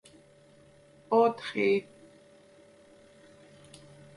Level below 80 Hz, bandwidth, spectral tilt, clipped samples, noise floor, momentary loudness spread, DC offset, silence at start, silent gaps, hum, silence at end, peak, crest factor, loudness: -74 dBFS; 11.5 kHz; -6 dB/octave; under 0.1%; -58 dBFS; 27 LU; under 0.1%; 1.1 s; none; none; 2.35 s; -12 dBFS; 20 dB; -27 LUFS